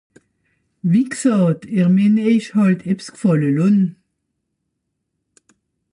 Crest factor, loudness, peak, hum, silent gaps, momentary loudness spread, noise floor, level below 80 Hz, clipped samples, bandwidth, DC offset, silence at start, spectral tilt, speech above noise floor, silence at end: 14 dB; -17 LUFS; -6 dBFS; none; none; 6 LU; -75 dBFS; -64 dBFS; under 0.1%; 11.5 kHz; under 0.1%; 0.85 s; -7.5 dB/octave; 59 dB; 2 s